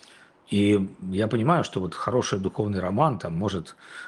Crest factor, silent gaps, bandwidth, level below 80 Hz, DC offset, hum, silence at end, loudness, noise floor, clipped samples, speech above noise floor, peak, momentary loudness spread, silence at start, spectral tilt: 20 dB; none; 11.5 kHz; -60 dBFS; under 0.1%; none; 0 s; -25 LUFS; -53 dBFS; under 0.1%; 28 dB; -6 dBFS; 8 LU; 0.5 s; -6.5 dB/octave